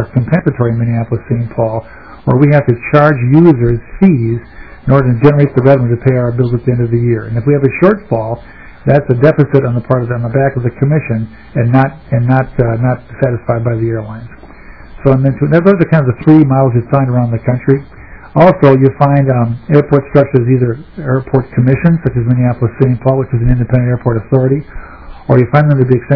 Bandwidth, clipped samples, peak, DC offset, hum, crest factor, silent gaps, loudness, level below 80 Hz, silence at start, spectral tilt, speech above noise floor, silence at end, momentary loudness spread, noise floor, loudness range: 5.4 kHz; 2%; 0 dBFS; 0.9%; none; 10 dB; none; -11 LUFS; -32 dBFS; 0 s; -11.5 dB/octave; 23 dB; 0 s; 8 LU; -33 dBFS; 3 LU